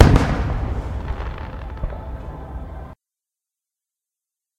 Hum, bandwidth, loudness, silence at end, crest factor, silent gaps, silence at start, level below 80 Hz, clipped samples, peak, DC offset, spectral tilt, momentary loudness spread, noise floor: none; 12 kHz; -25 LUFS; 1.65 s; 22 dB; none; 0 s; -28 dBFS; under 0.1%; 0 dBFS; under 0.1%; -7.5 dB/octave; 15 LU; -87 dBFS